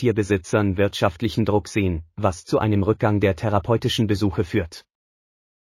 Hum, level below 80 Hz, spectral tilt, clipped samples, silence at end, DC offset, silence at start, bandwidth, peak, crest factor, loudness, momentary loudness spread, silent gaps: none; -44 dBFS; -6.5 dB/octave; under 0.1%; 0.8 s; under 0.1%; 0 s; 14 kHz; -4 dBFS; 16 dB; -22 LUFS; 5 LU; none